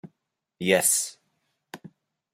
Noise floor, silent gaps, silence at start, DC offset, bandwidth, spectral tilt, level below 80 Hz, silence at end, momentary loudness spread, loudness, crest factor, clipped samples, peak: -79 dBFS; none; 0.05 s; under 0.1%; 16 kHz; -2 dB/octave; -72 dBFS; 0.45 s; 25 LU; -23 LUFS; 22 dB; under 0.1%; -6 dBFS